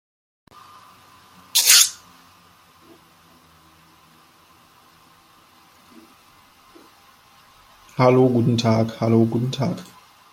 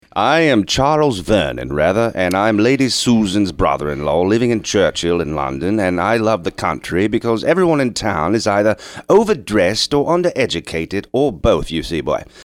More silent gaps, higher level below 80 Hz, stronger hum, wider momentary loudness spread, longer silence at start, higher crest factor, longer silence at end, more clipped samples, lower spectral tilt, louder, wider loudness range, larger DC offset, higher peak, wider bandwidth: neither; second, -62 dBFS vs -38 dBFS; neither; first, 16 LU vs 7 LU; first, 1.55 s vs 0.15 s; first, 24 dB vs 14 dB; first, 0.5 s vs 0 s; neither; second, -3.5 dB/octave vs -5 dB/octave; about the same, -17 LUFS vs -16 LUFS; first, 5 LU vs 2 LU; neither; about the same, 0 dBFS vs -2 dBFS; about the same, 16.5 kHz vs 16 kHz